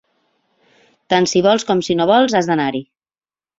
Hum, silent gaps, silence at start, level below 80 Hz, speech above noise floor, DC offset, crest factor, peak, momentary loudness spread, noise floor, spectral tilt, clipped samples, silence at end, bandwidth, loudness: none; none; 1.1 s; -58 dBFS; over 75 dB; under 0.1%; 16 dB; -2 dBFS; 6 LU; under -90 dBFS; -4.5 dB/octave; under 0.1%; 0.75 s; 7.8 kHz; -15 LUFS